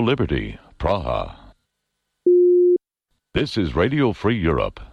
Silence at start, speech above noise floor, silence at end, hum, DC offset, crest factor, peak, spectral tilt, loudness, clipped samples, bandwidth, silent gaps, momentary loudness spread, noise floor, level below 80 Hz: 0 s; 56 dB; 0.05 s; none; under 0.1%; 12 dB; -8 dBFS; -8 dB/octave; -20 LUFS; under 0.1%; 6.8 kHz; none; 12 LU; -77 dBFS; -36 dBFS